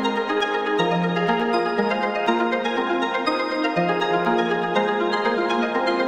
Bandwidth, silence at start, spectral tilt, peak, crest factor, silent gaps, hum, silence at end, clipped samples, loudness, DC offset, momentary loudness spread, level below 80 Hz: 10 kHz; 0 s; -5.5 dB/octave; -6 dBFS; 16 dB; none; none; 0 s; under 0.1%; -22 LUFS; under 0.1%; 2 LU; -64 dBFS